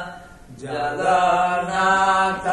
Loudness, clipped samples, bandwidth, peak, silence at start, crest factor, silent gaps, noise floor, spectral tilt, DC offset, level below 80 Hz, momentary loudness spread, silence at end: -19 LUFS; under 0.1%; 11.5 kHz; -6 dBFS; 0 s; 14 dB; none; -39 dBFS; -4 dB/octave; under 0.1%; -50 dBFS; 14 LU; 0 s